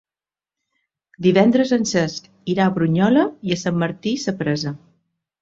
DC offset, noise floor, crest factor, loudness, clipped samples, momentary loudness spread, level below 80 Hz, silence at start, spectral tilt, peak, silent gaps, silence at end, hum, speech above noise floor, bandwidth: under 0.1%; under -90 dBFS; 18 dB; -19 LUFS; under 0.1%; 10 LU; -58 dBFS; 1.2 s; -6 dB/octave; -2 dBFS; none; 0.65 s; none; over 71 dB; 7.8 kHz